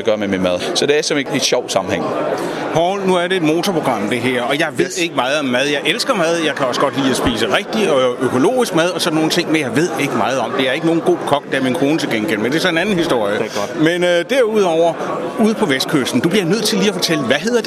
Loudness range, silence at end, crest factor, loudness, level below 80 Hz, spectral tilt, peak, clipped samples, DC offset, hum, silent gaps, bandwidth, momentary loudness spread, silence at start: 1 LU; 0 s; 16 dB; -16 LUFS; -50 dBFS; -4 dB/octave; 0 dBFS; under 0.1%; under 0.1%; none; none; 15 kHz; 3 LU; 0 s